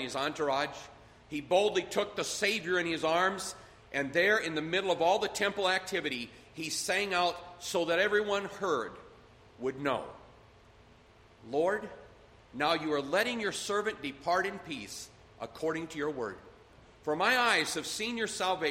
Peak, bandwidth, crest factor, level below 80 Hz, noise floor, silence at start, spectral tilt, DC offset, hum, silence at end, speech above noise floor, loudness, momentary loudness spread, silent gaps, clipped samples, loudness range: -12 dBFS; 16 kHz; 20 dB; -66 dBFS; -59 dBFS; 0 s; -3 dB/octave; under 0.1%; none; 0 s; 27 dB; -31 LUFS; 14 LU; none; under 0.1%; 7 LU